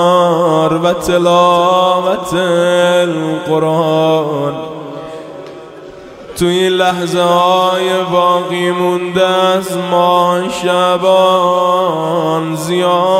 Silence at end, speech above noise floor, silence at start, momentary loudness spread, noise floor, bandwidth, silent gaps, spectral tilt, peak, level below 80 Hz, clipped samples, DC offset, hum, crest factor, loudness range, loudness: 0 s; 20 dB; 0 s; 15 LU; -32 dBFS; 16 kHz; none; -5 dB/octave; 0 dBFS; -48 dBFS; under 0.1%; under 0.1%; none; 12 dB; 5 LU; -12 LUFS